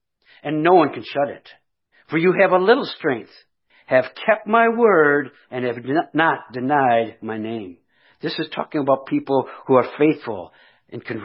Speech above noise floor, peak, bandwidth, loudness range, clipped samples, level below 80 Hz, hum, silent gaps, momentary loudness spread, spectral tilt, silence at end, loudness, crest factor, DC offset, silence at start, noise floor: 39 dB; -2 dBFS; 5.8 kHz; 4 LU; under 0.1%; -72 dBFS; none; none; 15 LU; -4 dB/octave; 0 s; -19 LUFS; 18 dB; under 0.1%; 0.45 s; -58 dBFS